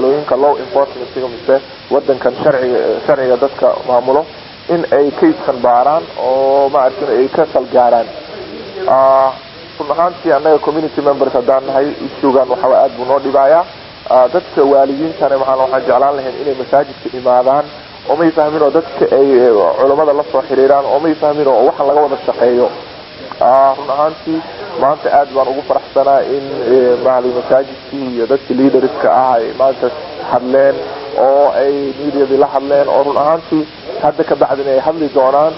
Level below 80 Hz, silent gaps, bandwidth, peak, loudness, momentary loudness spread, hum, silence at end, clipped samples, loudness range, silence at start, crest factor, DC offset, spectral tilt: -50 dBFS; none; 5.8 kHz; 0 dBFS; -12 LUFS; 9 LU; none; 0 s; under 0.1%; 2 LU; 0 s; 12 dB; under 0.1%; -9 dB/octave